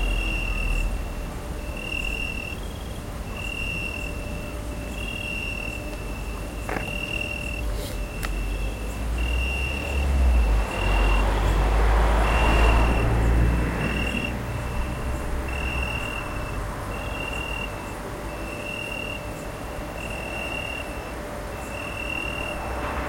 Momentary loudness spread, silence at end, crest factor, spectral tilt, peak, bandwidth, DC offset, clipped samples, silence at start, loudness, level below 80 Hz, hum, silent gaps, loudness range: 11 LU; 0 s; 18 dB; -5 dB/octave; -6 dBFS; 16.5 kHz; under 0.1%; under 0.1%; 0 s; -27 LUFS; -28 dBFS; none; none; 9 LU